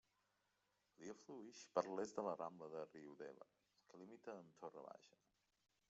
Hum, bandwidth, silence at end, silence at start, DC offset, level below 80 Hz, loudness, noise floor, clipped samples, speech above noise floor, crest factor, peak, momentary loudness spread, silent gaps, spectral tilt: none; 8 kHz; 0.8 s; 1 s; under 0.1%; under -90 dBFS; -52 LUFS; -86 dBFS; under 0.1%; 35 dB; 28 dB; -24 dBFS; 18 LU; none; -5 dB/octave